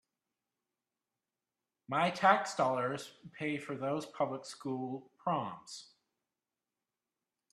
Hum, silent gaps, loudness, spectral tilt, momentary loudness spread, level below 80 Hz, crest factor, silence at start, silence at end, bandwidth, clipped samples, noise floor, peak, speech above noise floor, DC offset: none; none; -35 LUFS; -5 dB/octave; 15 LU; -82 dBFS; 26 dB; 1.9 s; 1.7 s; 13 kHz; under 0.1%; under -90 dBFS; -12 dBFS; over 55 dB; under 0.1%